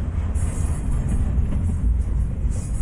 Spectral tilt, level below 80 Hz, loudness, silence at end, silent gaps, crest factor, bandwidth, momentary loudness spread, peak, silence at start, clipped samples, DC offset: -7.5 dB/octave; -22 dBFS; -24 LUFS; 0 s; none; 12 dB; 11.5 kHz; 2 LU; -10 dBFS; 0 s; under 0.1%; under 0.1%